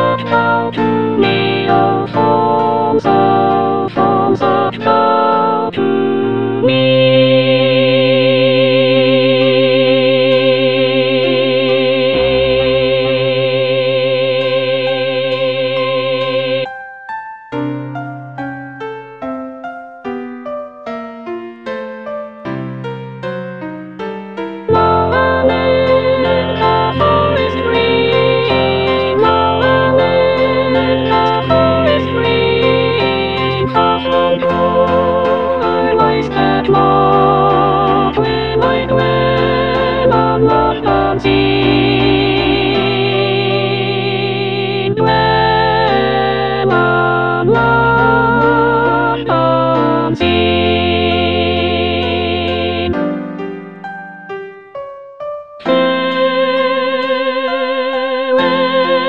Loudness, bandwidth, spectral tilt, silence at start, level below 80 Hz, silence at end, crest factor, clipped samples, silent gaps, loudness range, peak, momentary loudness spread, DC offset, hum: -12 LUFS; 6 kHz; -8 dB/octave; 0 s; -38 dBFS; 0 s; 12 dB; under 0.1%; none; 11 LU; 0 dBFS; 14 LU; 0.9%; none